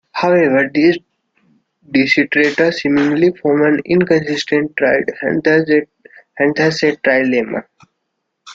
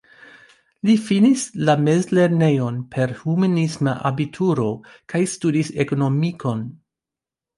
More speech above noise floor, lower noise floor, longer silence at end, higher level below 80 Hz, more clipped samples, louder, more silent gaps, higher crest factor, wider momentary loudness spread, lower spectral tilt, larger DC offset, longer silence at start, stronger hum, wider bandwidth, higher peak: second, 58 dB vs 69 dB; second, -72 dBFS vs -88 dBFS; second, 0 s vs 0.85 s; about the same, -56 dBFS vs -60 dBFS; neither; first, -14 LUFS vs -20 LUFS; neither; about the same, 14 dB vs 16 dB; second, 6 LU vs 9 LU; about the same, -6 dB/octave vs -6.5 dB/octave; neither; second, 0.15 s vs 0.85 s; neither; second, 7.6 kHz vs 11.5 kHz; first, 0 dBFS vs -4 dBFS